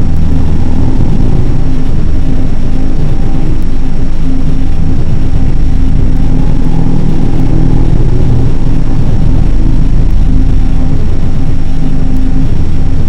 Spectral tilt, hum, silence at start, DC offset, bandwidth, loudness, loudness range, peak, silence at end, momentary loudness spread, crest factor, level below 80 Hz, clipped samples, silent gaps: -8.5 dB/octave; none; 0 s; 3%; 3.6 kHz; -13 LUFS; 3 LU; 0 dBFS; 0 s; 4 LU; 4 dB; -8 dBFS; 6%; none